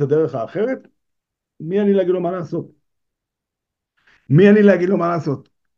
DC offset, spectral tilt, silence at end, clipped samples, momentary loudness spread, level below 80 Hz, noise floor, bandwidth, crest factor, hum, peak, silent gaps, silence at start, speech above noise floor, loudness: under 0.1%; -9 dB/octave; 0.4 s; under 0.1%; 17 LU; -64 dBFS; -83 dBFS; 6.8 kHz; 18 dB; none; 0 dBFS; none; 0 s; 67 dB; -17 LUFS